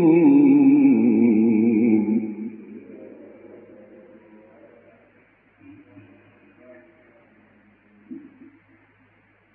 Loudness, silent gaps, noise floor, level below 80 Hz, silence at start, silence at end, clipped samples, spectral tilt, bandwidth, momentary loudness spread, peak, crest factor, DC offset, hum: -17 LUFS; none; -59 dBFS; -76 dBFS; 0 s; 1.35 s; under 0.1%; -13.5 dB/octave; 2.9 kHz; 27 LU; -6 dBFS; 16 dB; under 0.1%; none